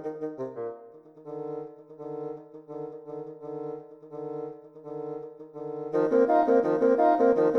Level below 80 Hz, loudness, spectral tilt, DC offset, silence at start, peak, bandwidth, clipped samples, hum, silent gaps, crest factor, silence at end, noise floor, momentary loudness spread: -70 dBFS; -27 LUFS; -8.5 dB/octave; under 0.1%; 0 s; -10 dBFS; 6.2 kHz; under 0.1%; none; none; 18 dB; 0 s; -49 dBFS; 21 LU